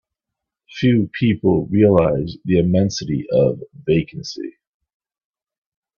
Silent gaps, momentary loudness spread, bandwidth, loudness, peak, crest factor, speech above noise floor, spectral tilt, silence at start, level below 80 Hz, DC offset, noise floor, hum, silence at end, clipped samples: none; 15 LU; 7.2 kHz; -18 LUFS; 0 dBFS; 18 dB; 66 dB; -7 dB/octave; 0.7 s; -48 dBFS; under 0.1%; -83 dBFS; none; 1.5 s; under 0.1%